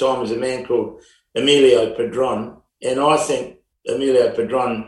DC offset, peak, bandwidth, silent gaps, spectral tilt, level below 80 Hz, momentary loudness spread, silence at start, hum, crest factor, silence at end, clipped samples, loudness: under 0.1%; -2 dBFS; 12 kHz; none; -4 dB/octave; -54 dBFS; 15 LU; 0 s; none; 16 dB; 0 s; under 0.1%; -18 LUFS